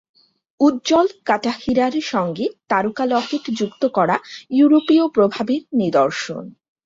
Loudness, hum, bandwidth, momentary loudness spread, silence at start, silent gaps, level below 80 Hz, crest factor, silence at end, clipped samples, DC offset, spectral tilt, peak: -19 LUFS; none; 7.8 kHz; 9 LU; 0.6 s; none; -58 dBFS; 16 dB; 0.35 s; under 0.1%; under 0.1%; -5.5 dB/octave; -4 dBFS